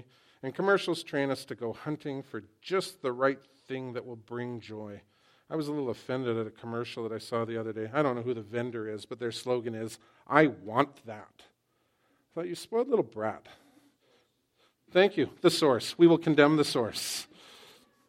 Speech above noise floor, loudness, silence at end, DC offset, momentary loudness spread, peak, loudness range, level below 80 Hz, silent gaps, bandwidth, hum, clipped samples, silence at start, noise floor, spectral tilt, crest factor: 45 dB; -30 LUFS; 0.5 s; under 0.1%; 18 LU; -4 dBFS; 10 LU; -76 dBFS; none; 16 kHz; none; under 0.1%; 0.45 s; -74 dBFS; -5 dB/octave; 26 dB